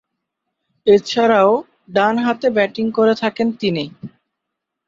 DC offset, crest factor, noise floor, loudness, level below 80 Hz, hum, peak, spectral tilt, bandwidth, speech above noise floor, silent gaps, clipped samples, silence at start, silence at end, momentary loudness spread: under 0.1%; 16 dB; -79 dBFS; -17 LUFS; -60 dBFS; none; -2 dBFS; -5.5 dB/octave; 7.6 kHz; 64 dB; none; under 0.1%; 0.85 s; 0.8 s; 8 LU